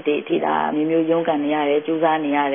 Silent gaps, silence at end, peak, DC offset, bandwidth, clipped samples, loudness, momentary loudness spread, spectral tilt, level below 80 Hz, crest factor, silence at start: none; 0 s; -6 dBFS; under 0.1%; 3.7 kHz; under 0.1%; -20 LUFS; 2 LU; -10.5 dB/octave; -76 dBFS; 14 dB; 0 s